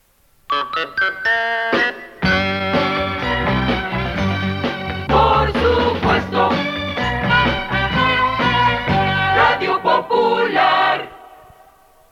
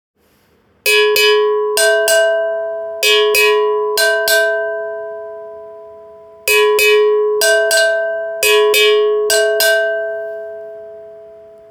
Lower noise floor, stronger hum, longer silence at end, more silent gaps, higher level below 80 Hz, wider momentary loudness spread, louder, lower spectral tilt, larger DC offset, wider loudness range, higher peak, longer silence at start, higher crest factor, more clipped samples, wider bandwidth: second, -50 dBFS vs -55 dBFS; neither; first, 0.85 s vs 0.3 s; neither; first, -34 dBFS vs -60 dBFS; second, 7 LU vs 18 LU; second, -17 LUFS vs -13 LUFS; first, -6 dB/octave vs 1.5 dB/octave; neither; about the same, 3 LU vs 3 LU; about the same, -2 dBFS vs 0 dBFS; second, 0.5 s vs 0.85 s; about the same, 16 dB vs 14 dB; neither; second, 16 kHz vs 19.5 kHz